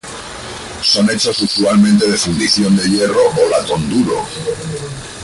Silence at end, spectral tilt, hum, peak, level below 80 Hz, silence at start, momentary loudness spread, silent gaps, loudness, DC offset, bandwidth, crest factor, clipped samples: 0 s; -4 dB/octave; none; -2 dBFS; -42 dBFS; 0.05 s; 16 LU; none; -13 LUFS; under 0.1%; 11.5 kHz; 12 dB; under 0.1%